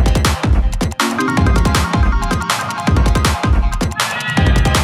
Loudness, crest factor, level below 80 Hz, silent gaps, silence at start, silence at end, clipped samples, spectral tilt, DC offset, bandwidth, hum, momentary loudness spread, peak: -15 LUFS; 12 dB; -18 dBFS; none; 0 s; 0 s; under 0.1%; -5 dB/octave; under 0.1%; 14.5 kHz; none; 4 LU; -2 dBFS